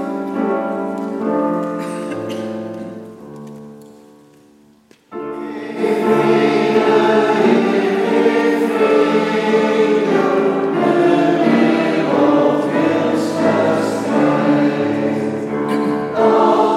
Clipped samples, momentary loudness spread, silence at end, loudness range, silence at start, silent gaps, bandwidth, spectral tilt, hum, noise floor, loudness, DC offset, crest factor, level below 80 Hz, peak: under 0.1%; 13 LU; 0 s; 13 LU; 0 s; none; 13.5 kHz; -6.5 dB/octave; none; -50 dBFS; -16 LUFS; under 0.1%; 16 dB; -64 dBFS; 0 dBFS